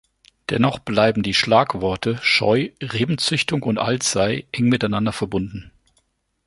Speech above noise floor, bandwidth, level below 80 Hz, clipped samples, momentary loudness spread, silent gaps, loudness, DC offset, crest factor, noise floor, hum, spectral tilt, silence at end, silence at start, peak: 47 dB; 11.5 kHz; -48 dBFS; under 0.1%; 9 LU; none; -20 LUFS; under 0.1%; 20 dB; -66 dBFS; none; -4.5 dB/octave; 0.8 s; 0.5 s; -2 dBFS